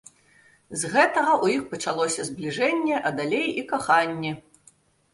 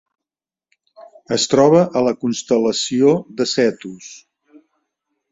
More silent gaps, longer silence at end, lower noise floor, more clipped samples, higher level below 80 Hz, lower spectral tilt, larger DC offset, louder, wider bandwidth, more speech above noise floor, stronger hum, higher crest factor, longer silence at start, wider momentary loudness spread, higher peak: neither; second, 0.75 s vs 1.15 s; second, -59 dBFS vs -89 dBFS; neither; second, -66 dBFS vs -60 dBFS; about the same, -3.5 dB/octave vs -4.5 dB/octave; neither; second, -24 LUFS vs -16 LUFS; first, 11.5 kHz vs 8 kHz; second, 35 dB vs 73 dB; neither; about the same, 20 dB vs 18 dB; second, 0.7 s vs 1 s; second, 10 LU vs 20 LU; second, -6 dBFS vs -2 dBFS